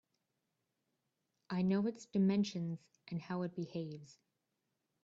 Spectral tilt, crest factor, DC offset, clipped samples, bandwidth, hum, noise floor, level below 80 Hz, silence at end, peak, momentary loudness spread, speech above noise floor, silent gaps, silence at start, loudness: -7.5 dB/octave; 16 dB; under 0.1%; under 0.1%; 7.8 kHz; none; -86 dBFS; -78 dBFS; 0.9 s; -24 dBFS; 13 LU; 49 dB; none; 1.5 s; -38 LUFS